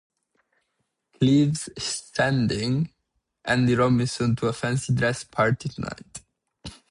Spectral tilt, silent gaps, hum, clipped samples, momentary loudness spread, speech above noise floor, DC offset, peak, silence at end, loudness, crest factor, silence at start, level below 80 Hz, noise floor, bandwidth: -5.5 dB/octave; none; none; under 0.1%; 18 LU; 54 dB; under 0.1%; -8 dBFS; 0.15 s; -24 LUFS; 18 dB; 1.2 s; -52 dBFS; -77 dBFS; 11.5 kHz